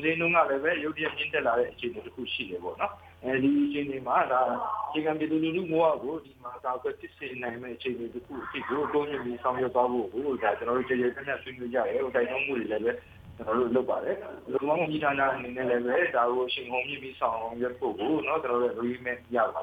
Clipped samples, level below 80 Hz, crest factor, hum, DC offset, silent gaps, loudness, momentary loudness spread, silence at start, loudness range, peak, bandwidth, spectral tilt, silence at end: under 0.1%; -62 dBFS; 18 dB; none; under 0.1%; none; -29 LUFS; 10 LU; 0 s; 3 LU; -10 dBFS; 5 kHz; -7.5 dB/octave; 0 s